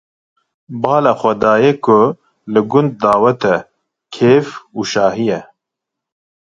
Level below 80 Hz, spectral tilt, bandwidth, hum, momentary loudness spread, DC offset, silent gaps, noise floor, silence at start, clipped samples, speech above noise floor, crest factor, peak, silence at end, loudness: -54 dBFS; -6.5 dB/octave; 7.6 kHz; none; 12 LU; under 0.1%; none; -81 dBFS; 0.7 s; under 0.1%; 68 dB; 16 dB; 0 dBFS; 1.15 s; -14 LUFS